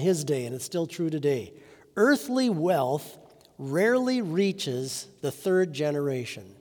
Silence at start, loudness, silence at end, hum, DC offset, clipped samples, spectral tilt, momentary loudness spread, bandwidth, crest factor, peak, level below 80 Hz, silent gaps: 0 s; -27 LUFS; 0.05 s; none; under 0.1%; under 0.1%; -5.5 dB/octave; 11 LU; over 20 kHz; 18 dB; -10 dBFS; -74 dBFS; none